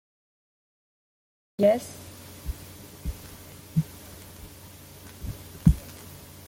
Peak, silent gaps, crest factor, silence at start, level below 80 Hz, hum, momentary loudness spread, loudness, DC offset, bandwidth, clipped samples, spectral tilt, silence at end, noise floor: -4 dBFS; none; 26 dB; 1.6 s; -40 dBFS; none; 22 LU; -28 LUFS; under 0.1%; 17 kHz; under 0.1%; -7 dB/octave; 0.3 s; -47 dBFS